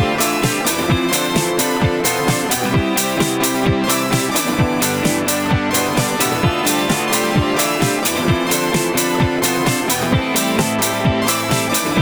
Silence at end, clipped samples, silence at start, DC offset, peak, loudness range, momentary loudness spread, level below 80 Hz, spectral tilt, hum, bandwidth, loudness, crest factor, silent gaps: 0 s; under 0.1%; 0 s; under 0.1%; -2 dBFS; 0 LU; 1 LU; -38 dBFS; -4 dB/octave; none; over 20 kHz; -16 LUFS; 14 dB; none